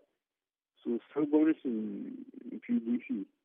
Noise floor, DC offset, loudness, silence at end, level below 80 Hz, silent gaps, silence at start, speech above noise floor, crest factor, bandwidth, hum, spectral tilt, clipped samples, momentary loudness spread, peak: under -90 dBFS; under 0.1%; -33 LUFS; 0.2 s; under -90 dBFS; none; 0.85 s; over 57 dB; 18 dB; 3.7 kHz; none; -7 dB/octave; under 0.1%; 17 LU; -16 dBFS